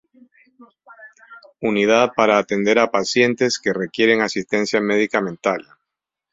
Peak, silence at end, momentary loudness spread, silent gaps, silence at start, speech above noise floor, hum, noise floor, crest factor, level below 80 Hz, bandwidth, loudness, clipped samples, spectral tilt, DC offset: -2 dBFS; 0.7 s; 7 LU; none; 0.6 s; 65 dB; none; -83 dBFS; 18 dB; -62 dBFS; 7.8 kHz; -18 LUFS; under 0.1%; -4 dB/octave; under 0.1%